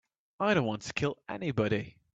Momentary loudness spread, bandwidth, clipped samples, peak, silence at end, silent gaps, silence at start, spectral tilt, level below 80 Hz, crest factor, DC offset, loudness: 6 LU; 8.2 kHz; under 0.1%; -14 dBFS; 0.25 s; none; 0.4 s; -6 dB/octave; -62 dBFS; 18 dB; under 0.1%; -31 LUFS